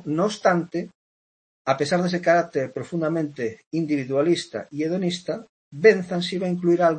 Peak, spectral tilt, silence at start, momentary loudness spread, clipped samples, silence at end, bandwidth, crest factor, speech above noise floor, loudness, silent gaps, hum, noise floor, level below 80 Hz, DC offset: -4 dBFS; -6 dB/octave; 0.05 s; 13 LU; under 0.1%; 0 s; 8.8 kHz; 20 dB; over 68 dB; -23 LUFS; 0.95-1.65 s, 3.67-3.71 s, 5.49-5.71 s; none; under -90 dBFS; -68 dBFS; under 0.1%